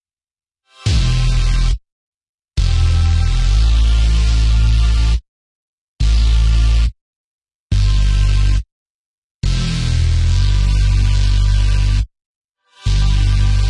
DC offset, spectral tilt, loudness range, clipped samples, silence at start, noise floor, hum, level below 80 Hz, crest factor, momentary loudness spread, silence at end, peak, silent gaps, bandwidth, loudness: under 0.1%; -5 dB/octave; 3 LU; under 0.1%; 0.8 s; under -90 dBFS; none; -16 dBFS; 10 dB; 7 LU; 0 s; -4 dBFS; 1.92-2.21 s, 2.29-2.38 s, 5.28-5.96 s, 7.01-7.39 s, 7.55-7.70 s, 8.72-9.40 s, 12.26-12.49 s; 10.5 kHz; -17 LUFS